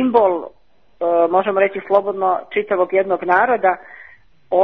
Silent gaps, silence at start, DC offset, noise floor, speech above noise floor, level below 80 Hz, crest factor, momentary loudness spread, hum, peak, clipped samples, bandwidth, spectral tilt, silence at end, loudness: none; 0 s; 0.3%; -47 dBFS; 31 dB; -64 dBFS; 16 dB; 7 LU; none; 0 dBFS; under 0.1%; 4.9 kHz; -8 dB/octave; 0 s; -17 LUFS